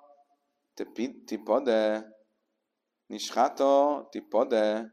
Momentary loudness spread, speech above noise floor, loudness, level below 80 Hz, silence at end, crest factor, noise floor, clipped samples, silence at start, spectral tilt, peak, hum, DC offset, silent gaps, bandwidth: 15 LU; 56 dB; -27 LUFS; -80 dBFS; 0.05 s; 18 dB; -83 dBFS; under 0.1%; 0.75 s; -4 dB/octave; -12 dBFS; none; under 0.1%; none; 14 kHz